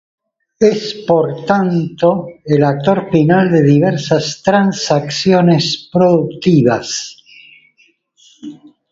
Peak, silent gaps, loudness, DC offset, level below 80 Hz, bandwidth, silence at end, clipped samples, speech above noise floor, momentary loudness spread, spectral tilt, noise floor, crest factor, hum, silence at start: 0 dBFS; none; -13 LUFS; under 0.1%; -50 dBFS; 7.8 kHz; 0.4 s; under 0.1%; 42 dB; 11 LU; -6 dB/octave; -55 dBFS; 14 dB; none; 0.6 s